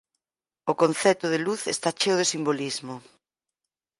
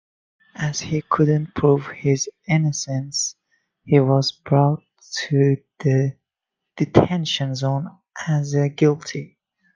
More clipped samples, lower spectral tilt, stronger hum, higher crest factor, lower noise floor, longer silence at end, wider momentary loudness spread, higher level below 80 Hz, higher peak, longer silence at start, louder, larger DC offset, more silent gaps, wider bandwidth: neither; second, -3.5 dB/octave vs -5.5 dB/octave; neither; about the same, 20 dB vs 20 dB; first, under -90 dBFS vs -83 dBFS; first, 1 s vs 0.5 s; about the same, 12 LU vs 10 LU; second, -74 dBFS vs -54 dBFS; second, -8 dBFS vs 0 dBFS; about the same, 0.65 s vs 0.6 s; second, -25 LUFS vs -21 LUFS; neither; neither; first, 11.5 kHz vs 9.4 kHz